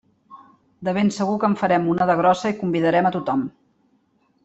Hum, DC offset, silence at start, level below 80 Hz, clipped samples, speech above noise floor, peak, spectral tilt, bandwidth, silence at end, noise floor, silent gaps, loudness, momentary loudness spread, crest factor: none; under 0.1%; 0.3 s; -62 dBFS; under 0.1%; 44 dB; -6 dBFS; -6.5 dB/octave; 8.2 kHz; 0.95 s; -63 dBFS; none; -20 LUFS; 8 LU; 16 dB